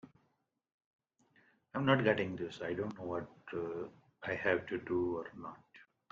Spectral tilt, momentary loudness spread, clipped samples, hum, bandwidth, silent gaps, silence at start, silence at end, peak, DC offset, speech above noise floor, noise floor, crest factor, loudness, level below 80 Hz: -7.5 dB/octave; 17 LU; under 0.1%; none; 7.6 kHz; 0.74-0.79 s, 0.86-0.99 s; 0.05 s; 0.3 s; -14 dBFS; under 0.1%; 44 dB; -80 dBFS; 24 dB; -37 LUFS; -74 dBFS